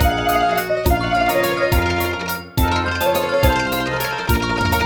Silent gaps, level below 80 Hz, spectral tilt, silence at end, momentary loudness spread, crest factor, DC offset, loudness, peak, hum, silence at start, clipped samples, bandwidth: none; -26 dBFS; -5 dB/octave; 0 s; 4 LU; 14 dB; under 0.1%; -18 LUFS; -4 dBFS; none; 0 s; under 0.1%; over 20 kHz